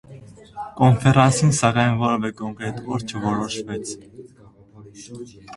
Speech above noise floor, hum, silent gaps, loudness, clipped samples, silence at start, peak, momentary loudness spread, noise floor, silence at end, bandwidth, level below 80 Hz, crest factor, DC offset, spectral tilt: 28 dB; none; none; -20 LUFS; under 0.1%; 0.1 s; 0 dBFS; 22 LU; -48 dBFS; 0 s; 11.5 kHz; -50 dBFS; 22 dB; under 0.1%; -5.5 dB/octave